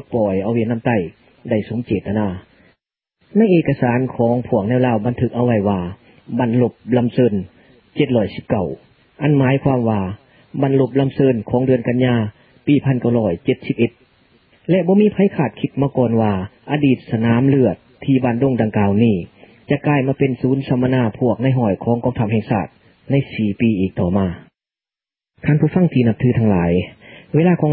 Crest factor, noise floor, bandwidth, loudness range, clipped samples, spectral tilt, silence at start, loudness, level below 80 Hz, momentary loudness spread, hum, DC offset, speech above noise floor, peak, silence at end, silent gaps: 16 dB; under -90 dBFS; 4.6 kHz; 3 LU; under 0.1%; -13.5 dB/octave; 0.1 s; -18 LUFS; -44 dBFS; 9 LU; none; under 0.1%; over 74 dB; -2 dBFS; 0 s; none